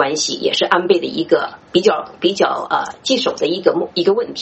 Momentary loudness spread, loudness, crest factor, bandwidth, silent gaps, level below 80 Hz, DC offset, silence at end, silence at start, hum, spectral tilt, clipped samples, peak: 4 LU; -17 LUFS; 16 dB; 8.4 kHz; none; -60 dBFS; under 0.1%; 0 s; 0 s; none; -3.5 dB/octave; under 0.1%; 0 dBFS